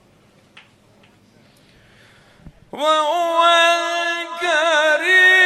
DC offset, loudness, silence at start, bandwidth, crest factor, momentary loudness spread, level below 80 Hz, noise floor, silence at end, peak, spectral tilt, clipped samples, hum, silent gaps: under 0.1%; -15 LUFS; 2.75 s; 13.5 kHz; 16 dB; 10 LU; -60 dBFS; -53 dBFS; 0 s; -4 dBFS; -0.5 dB/octave; under 0.1%; none; none